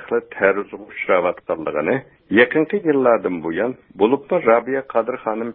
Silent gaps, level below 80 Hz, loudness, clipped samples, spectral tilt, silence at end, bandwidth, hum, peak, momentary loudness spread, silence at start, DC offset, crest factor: none; -58 dBFS; -19 LUFS; under 0.1%; -11 dB/octave; 0 s; 4 kHz; none; 0 dBFS; 9 LU; 0 s; under 0.1%; 18 dB